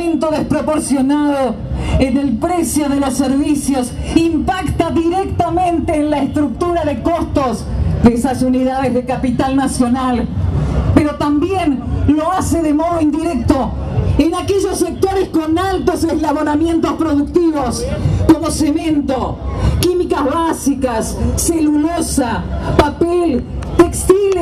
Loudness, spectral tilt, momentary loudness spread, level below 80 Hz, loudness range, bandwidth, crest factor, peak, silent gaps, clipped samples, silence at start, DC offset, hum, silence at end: -15 LUFS; -6 dB/octave; 4 LU; -26 dBFS; 1 LU; 15 kHz; 14 dB; 0 dBFS; none; under 0.1%; 0 s; under 0.1%; none; 0 s